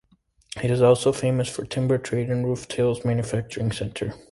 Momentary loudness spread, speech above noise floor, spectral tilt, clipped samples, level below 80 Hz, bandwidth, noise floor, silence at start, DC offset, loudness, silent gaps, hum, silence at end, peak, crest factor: 11 LU; 38 dB; -6 dB/octave; under 0.1%; -52 dBFS; 11.5 kHz; -61 dBFS; 0.55 s; under 0.1%; -24 LUFS; none; none; 0.15 s; -6 dBFS; 18 dB